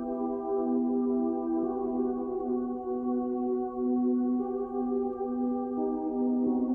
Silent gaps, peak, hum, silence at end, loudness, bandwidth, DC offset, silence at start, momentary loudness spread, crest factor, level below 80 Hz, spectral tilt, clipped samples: none; -18 dBFS; none; 0 s; -30 LUFS; 1.7 kHz; under 0.1%; 0 s; 5 LU; 12 dB; -60 dBFS; -11.5 dB/octave; under 0.1%